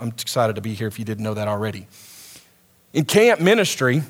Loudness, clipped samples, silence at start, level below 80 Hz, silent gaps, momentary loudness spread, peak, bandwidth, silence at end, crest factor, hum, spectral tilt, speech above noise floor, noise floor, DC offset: -20 LUFS; under 0.1%; 0 s; -66 dBFS; none; 21 LU; -2 dBFS; over 20 kHz; 0 s; 20 dB; none; -5 dB/octave; 36 dB; -56 dBFS; under 0.1%